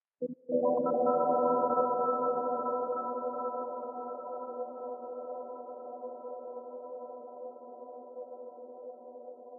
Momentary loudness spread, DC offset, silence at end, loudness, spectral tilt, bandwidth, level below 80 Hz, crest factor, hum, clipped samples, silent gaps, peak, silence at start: 19 LU; under 0.1%; 0 s; -33 LUFS; 5.5 dB/octave; 1.5 kHz; -86 dBFS; 18 dB; none; under 0.1%; none; -16 dBFS; 0.2 s